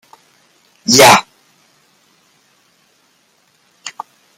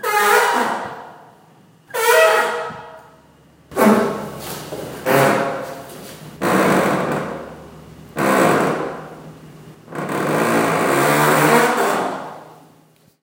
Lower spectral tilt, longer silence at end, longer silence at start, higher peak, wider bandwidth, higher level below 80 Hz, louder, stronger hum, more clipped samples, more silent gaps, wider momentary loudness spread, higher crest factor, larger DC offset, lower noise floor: second, -2 dB/octave vs -4.5 dB/octave; second, 0.5 s vs 0.7 s; first, 0.9 s vs 0 s; about the same, 0 dBFS vs 0 dBFS; first, over 20 kHz vs 17 kHz; about the same, -56 dBFS vs -56 dBFS; first, -9 LUFS vs -17 LUFS; neither; neither; neither; first, 26 LU vs 20 LU; about the same, 18 dB vs 18 dB; neither; first, -57 dBFS vs -53 dBFS